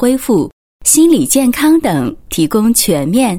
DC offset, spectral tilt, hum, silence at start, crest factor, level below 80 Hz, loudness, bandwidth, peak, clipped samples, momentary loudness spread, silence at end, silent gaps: under 0.1%; -4 dB/octave; none; 0 s; 12 dB; -40 dBFS; -11 LUFS; 17.5 kHz; 0 dBFS; under 0.1%; 8 LU; 0 s; 0.53-0.80 s